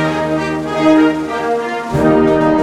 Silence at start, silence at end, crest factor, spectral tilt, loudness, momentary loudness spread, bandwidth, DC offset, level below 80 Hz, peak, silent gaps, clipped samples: 0 s; 0 s; 12 dB; -6.5 dB/octave; -14 LUFS; 7 LU; 11.5 kHz; under 0.1%; -38 dBFS; 0 dBFS; none; under 0.1%